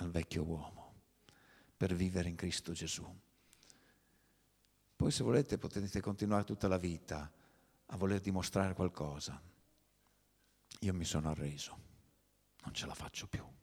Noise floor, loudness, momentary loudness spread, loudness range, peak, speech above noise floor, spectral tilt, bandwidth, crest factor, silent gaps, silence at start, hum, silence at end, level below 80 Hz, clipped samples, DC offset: -74 dBFS; -39 LUFS; 12 LU; 6 LU; -18 dBFS; 36 dB; -5.5 dB/octave; 17 kHz; 22 dB; none; 0 s; 50 Hz at -65 dBFS; 0.1 s; -58 dBFS; under 0.1%; under 0.1%